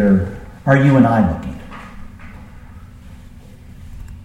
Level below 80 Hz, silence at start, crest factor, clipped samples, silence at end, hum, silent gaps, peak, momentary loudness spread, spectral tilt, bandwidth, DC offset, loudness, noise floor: -36 dBFS; 0 s; 18 dB; under 0.1%; 0.05 s; none; none; 0 dBFS; 26 LU; -9 dB/octave; 8.6 kHz; under 0.1%; -15 LUFS; -38 dBFS